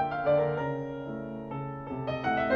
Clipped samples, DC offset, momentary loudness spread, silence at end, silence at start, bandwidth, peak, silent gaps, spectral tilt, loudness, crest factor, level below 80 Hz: under 0.1%; under 0.1%; 11 LU; 0 s; 0 s; 6.6 kHz; -14 dBFS; none; -8.5 dB/octave; -31 LUFS; 16 dB; -56 dBFS